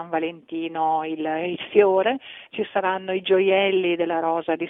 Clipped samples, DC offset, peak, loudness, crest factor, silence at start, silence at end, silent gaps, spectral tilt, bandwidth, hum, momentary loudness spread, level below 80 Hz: under 0.1%; under 0.1%; -4 dBFS; -22 LUFS; 18 dB; 0 s; 0 s; none; -8 dB/octave; 3.9 kHz; none; 11 LU; -70 dBFS